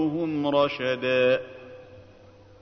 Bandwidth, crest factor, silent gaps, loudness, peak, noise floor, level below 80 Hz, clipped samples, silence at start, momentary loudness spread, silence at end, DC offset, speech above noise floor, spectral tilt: 6.4 kHz; 16 dB; none; -24 LUFS; -10 dBFS; -51 dBFS; -64 dBFS; under 0.1%; 0 s; 21 LU; 0.6 s; under 0.1%; 27 dB; -7 dB/octave